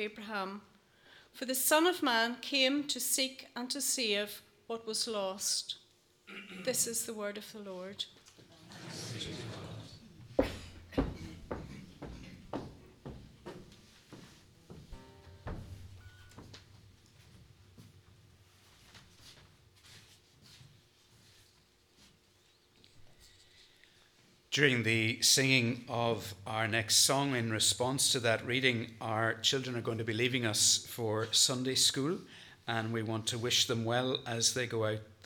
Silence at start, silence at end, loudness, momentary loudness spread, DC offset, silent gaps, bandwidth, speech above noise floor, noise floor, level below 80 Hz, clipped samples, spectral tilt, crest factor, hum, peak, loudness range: 0 s; 0.1 s; -31 LUFS; 23 LU; under 0.1%; none; 19 kHz; 35 dB; -67 dBFS; -60 dBFS; under 0.1%; -2.5 dB/octave; 24 dB; none; -10 dBFS; 22 LU